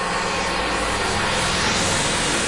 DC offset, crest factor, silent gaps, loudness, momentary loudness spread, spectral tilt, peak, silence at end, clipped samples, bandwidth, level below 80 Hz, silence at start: under 0.1%; 12 dB; none; -20 LUFS; 3 LU; -2.5 dB/octave; -8 dBFS; 0 s; under 0.1%; 11.5 kHz; -36 dBFS; 0 s